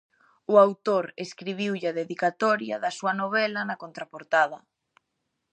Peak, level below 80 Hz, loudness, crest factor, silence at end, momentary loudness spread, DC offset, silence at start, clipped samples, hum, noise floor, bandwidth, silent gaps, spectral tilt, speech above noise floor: -4 dBFS; -82 dBFS; -25 LUFS; 22 dB; 0.95 s; 16 LU; under 0.1%; 0.5 s; under 0.1%; none; -80 dBFS; 9.2 kHz; none; -5 dB/octave; 54 dB